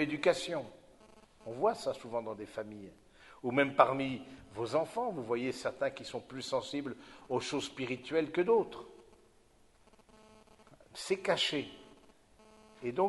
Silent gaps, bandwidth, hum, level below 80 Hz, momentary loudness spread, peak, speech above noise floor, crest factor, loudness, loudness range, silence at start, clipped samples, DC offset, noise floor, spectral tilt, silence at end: none; 11.5 kHz; none; -70 dBFS; 18 LU; -8 dBFS; 31 dB; 28 dB; -34 LUFS; 5 LU; 0 s; under 0.1%; under 0.1%; -65 dBFS; -4.5 dB/octave; 0 s